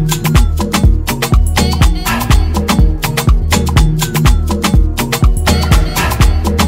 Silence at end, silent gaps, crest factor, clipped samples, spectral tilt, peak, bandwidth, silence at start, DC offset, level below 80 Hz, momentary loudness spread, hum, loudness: 0 s; none; 10 dB; under 0.1%; -5 dB/octave; 0 dBFS; 16.5 kHz; 0 s; under 0.1%; -12 dBFS; 2 LU; none; -12 LUFS